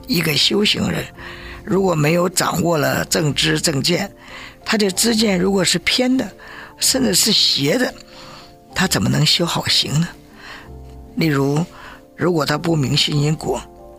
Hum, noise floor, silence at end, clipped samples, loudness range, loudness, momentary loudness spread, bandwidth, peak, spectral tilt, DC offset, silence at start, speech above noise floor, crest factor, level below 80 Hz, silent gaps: none; -40 dBFS; 0 s; under 0.1%; 4 LU; -17 LUFS; 19 LU; 16 kHz; -2 dBFS; -3.5 dB/octave; under 0.1%; 0 s; 22 dB; 16 dB; -44 dBFS; none